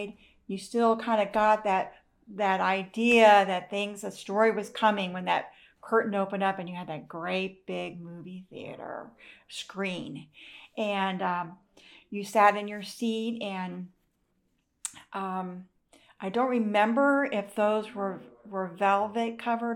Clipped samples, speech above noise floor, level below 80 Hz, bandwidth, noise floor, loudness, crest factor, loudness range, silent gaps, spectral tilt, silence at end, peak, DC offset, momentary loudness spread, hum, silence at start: under 0.1%; 46 dB; -72 dBFS; 15 kHz; -74 dBFS; -27 LUFS; 20 dB; 12 LU; none; -5 dB/octave; 0 s; -8 dBFS; under 0.1%; 19 LU; none; 0 s